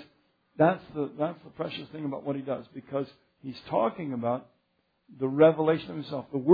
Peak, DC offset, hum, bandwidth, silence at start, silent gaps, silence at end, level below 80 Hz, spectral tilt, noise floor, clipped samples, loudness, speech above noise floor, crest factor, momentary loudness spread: -8 dBFS; under 0.1%; none; 5 kHz; 0 s; none; 0 s; -70 dBFS; -10 dB/octave; -74 dBFS; under 0.1%; -29 LUFS; 46 dB; 22 dB; 14 LU